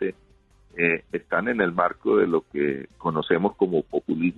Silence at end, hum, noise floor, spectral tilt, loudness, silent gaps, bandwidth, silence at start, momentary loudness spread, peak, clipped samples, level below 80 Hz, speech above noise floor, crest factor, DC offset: 0.05 s; none; -57 dBFS; -8.5 dB/octave; -24 LUFS; none; 4.2 kHz; 0 s; 6 LU; -6 dBFS; under 0.1%; -58 dBFS; 34 dB; 18 dB; under 0.1%